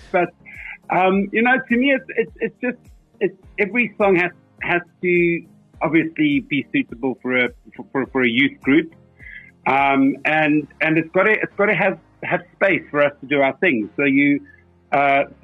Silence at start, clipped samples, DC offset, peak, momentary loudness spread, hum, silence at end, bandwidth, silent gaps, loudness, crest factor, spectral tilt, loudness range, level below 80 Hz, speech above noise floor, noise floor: 0.15 s; under 0.1%; under 0.1%; -4 dBFS; 9 LU; none; 0.15 s; 5.2 kHz; none; -19 LUFS; 14 dB; -8 dB/octave; 2 LU; -54 dBFS; 22 dB; -41 dBFS